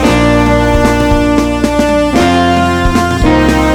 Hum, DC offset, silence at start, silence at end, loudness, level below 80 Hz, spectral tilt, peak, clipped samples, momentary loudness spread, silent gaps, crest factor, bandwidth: none; under 0.1%; 0 s; 0 s; -10 LUFS; -18 dBFS; -6 dB/octave; 0 dBFS; under 0.1%; 2 LU; none; 8 dB; 17.5 kHz